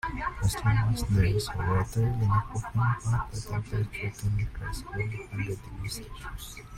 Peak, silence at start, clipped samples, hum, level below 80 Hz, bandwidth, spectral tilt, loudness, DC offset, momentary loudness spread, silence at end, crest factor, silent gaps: -12 dBFS; 0.05 s; under 0.1%; none; -40 dBFS; 15 kHz; -6 dB/octave; -30 LUFS; under 0.1%; 11 LU; 0 s; 18 dB; none